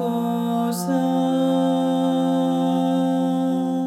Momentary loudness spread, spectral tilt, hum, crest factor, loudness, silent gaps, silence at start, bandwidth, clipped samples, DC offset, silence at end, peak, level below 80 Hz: 3 LU; -7 dB/octave; none; 10 dB; -21 LUFS; none; 0 s; 15 kHz; under 0.1%; under 0.1%; 0 s; -10 dBFS; -70 dBFS